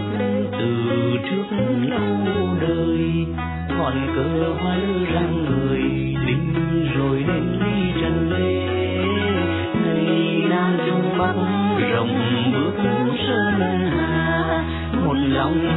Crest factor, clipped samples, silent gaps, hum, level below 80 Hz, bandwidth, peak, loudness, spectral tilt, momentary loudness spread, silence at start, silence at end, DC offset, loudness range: 12 dB; under 0.1%; none; none; -38 dBFS; 4.1 kHz; -8 dBFS; -21 LUFS; -10.5 dB/octave; 3 LU; 0 s; 0 s; under 0.1%; 2 LU